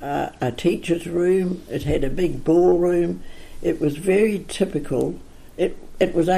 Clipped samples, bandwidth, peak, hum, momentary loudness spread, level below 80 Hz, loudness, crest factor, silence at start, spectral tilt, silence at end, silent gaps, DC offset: under 0.1%; 14.5 kHz; -6 dBFS; none; 9 LU; -38 dBFS; -22 LUFS; 16 dB; 0 s; -6.5 dB/octave; 0 s; none; under 0.1%